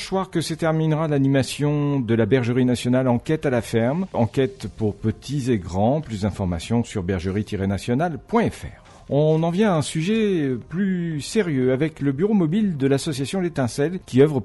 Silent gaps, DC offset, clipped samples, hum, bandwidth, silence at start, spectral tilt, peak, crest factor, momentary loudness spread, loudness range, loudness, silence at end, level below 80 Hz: none; under 0.1%; under 0.1%; none; 11.5 kHz; 0 s; -6.5 dB/octave; -4 dBFS; 16 dB; 6 LU; 3 LU; -22 LUFS; 0 s; -46 dBFS